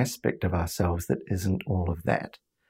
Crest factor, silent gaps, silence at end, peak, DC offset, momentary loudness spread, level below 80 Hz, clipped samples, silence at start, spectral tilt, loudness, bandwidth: 20 dB; none; 0.35 s; -8 dBFS; under 0.1%; 3 LU; -50 dBFS; under 0.1%; 0 s; -6 dB/octave; -29 LUFS; 16 kHz